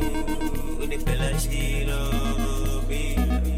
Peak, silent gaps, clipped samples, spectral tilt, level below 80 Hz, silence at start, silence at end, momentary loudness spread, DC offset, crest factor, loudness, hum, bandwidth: -12 dBFS; none; under 0.1%; -5 dB/octave; -24 dBFS; 0 s; 0 s; 4 LU; under 0.1%; 10 dB; -27 LUFS; none; 15.5 kHz